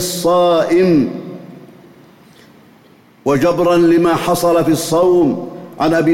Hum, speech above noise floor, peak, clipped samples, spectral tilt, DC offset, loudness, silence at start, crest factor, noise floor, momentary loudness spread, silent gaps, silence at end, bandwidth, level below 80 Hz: none; 34 dB; -4 dBFS; under 0.1%; -5.5 dB/octave; under 0.1%; -13 LUFS; 0 s; 10 dB; -46 dBFS; 12 LU; none; 0 s; 16.5 kHz; -48 dBFS